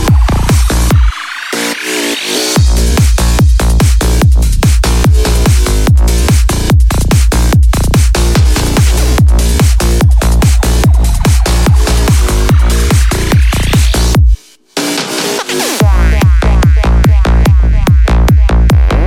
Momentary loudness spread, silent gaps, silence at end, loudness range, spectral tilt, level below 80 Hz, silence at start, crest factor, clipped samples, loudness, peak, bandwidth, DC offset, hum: 4 LU; none; 0 s; 2 LU; -5 dB/octave; -10 dBFS; 0 s; 8 dB; under 0.1%; -10 LUFS; 0 dBFS; 16.5 kHz; under 0.1%; none